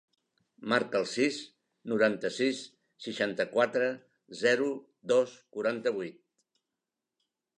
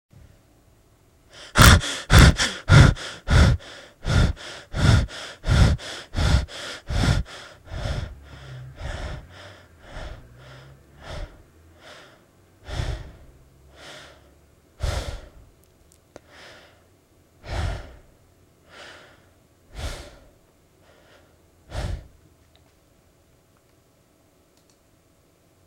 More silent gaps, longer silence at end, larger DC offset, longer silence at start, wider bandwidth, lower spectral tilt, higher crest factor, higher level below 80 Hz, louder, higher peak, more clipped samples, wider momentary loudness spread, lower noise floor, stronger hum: neither; second, 1.45 s vs 3.65 s; neither; second, 0.6 s vs 1.4 s; second, 11 kHz vs 16 kHz; about the same, -4 dB/octave vs -4.5 dB/octave; about the same, 20 dB vs 24 dB; second, -82 dBFS vs -30 dBFS; second, -30 LUFS vs -21 LUFS; second, -12 dBFS vs 0 dBFS; neither; second, 16 LU vs 29 LU; first, -88 dBFS vs -60 dBFS; neither